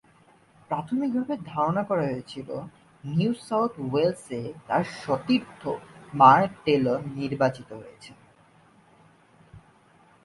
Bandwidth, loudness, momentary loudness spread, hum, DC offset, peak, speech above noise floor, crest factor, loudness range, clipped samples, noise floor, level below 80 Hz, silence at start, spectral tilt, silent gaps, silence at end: 11.5 kHz; -25 LUFS; 17 LU; none; under 0.1%; -2 dBFS; 33 dB; 26 dB; 7 LU; under 0.1%; -58 dBFS; -62 dBFS; 0.7 s; -7 dB/octave; none; 0.65 s